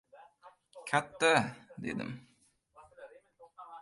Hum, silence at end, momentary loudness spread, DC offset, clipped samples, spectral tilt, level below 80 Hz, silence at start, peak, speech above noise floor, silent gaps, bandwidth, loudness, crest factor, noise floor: none; 0 s; 27 LU; under 0.1%; under 0.1%; -4 dB/octave; -72 dBFS; 0.15 s; -12 dBFS; 37 dB; none; 11.5 kHz; -32 LUFS; 24 dB; -68 dBFS